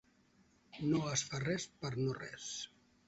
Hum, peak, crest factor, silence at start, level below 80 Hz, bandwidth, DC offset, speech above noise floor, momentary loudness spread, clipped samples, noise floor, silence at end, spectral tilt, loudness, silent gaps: none; -20 dBFS; 20 dB; 0.75 s; -68 dBFS; 8 kHz; under 0.1%; 32 dB; 10 LU; under 0.1%; -70 dBFS; 0.4 s; -5 dB/octave; -39 LUFS; none